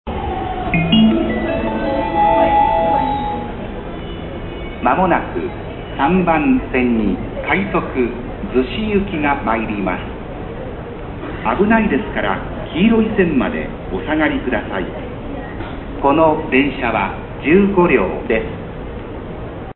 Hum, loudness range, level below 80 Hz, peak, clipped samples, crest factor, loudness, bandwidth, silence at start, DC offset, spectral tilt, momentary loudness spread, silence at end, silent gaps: none; 4 LU; -32 dBFS; 0 dBFS; under 0.1%; 18 dB; -17 LUFS; 4.2 kHz; 0.05 s; under 0.1%; -11.5 dB/octave; 15 LU; 0.05 s; none